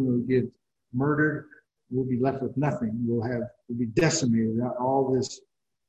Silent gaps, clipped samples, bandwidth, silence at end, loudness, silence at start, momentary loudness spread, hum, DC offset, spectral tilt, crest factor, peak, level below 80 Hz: none; under 0.1%; 8.6 kHz; 0.5 s; -27 LUFS; 0 s; 11 LU; none; under 0.1%; -6 dB/octave; 18 dB; -8 dBFS; -58 dBFS